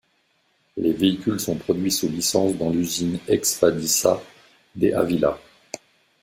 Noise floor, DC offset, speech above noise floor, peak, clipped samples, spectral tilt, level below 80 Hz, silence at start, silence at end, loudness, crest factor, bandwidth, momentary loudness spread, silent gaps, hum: -66 dBFS; under 0.1%; 45 dB; -2 dBFS; under 0.1%; -4 dB/octave; -56 dBFS; 0.75 s; 0.85 s; -22 LUFS; 20 dB; 16.5 kHz; 17 LU; none; none